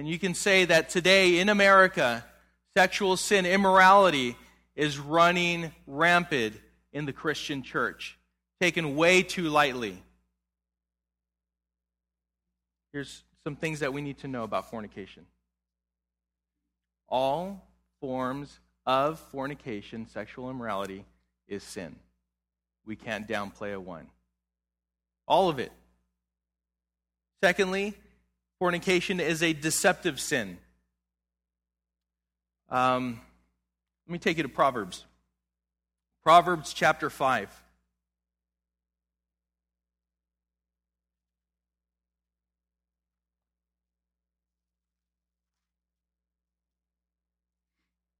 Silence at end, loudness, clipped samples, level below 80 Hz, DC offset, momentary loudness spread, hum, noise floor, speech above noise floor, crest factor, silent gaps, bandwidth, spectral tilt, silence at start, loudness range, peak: 10.7 s; -25 LUFS; under 0.1%; -62 dBFS; under 0.1%; 20 LU; none; -90 dBFS; 63 dB; 24 dB; none; 16 kHz; -4 dB/octave; 0 s; 16 LU; -6 dBFS